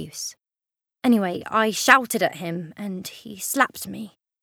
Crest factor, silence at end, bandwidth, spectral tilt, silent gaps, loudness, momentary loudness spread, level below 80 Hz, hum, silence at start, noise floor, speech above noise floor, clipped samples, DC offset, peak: 24 dB; 0.35 s; 19 kHz; -3.5 dB/octave; none; -22 LUFS; 18 LU; -68 dBFS; none; 0 s; -86 dBFS; 63 dB; under 0.1%; under 0.1%; 0 dBFS